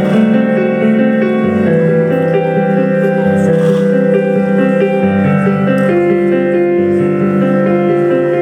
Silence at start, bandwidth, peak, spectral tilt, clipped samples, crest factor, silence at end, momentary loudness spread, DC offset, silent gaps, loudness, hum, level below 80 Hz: 0 s; 9.2 kHz; 0 dBFS; -9 dB/octave; under 0.1%; 10 dB; 0 s; 1 LU; under 0.1%; none; -11 LUFS; none; -54 dBFS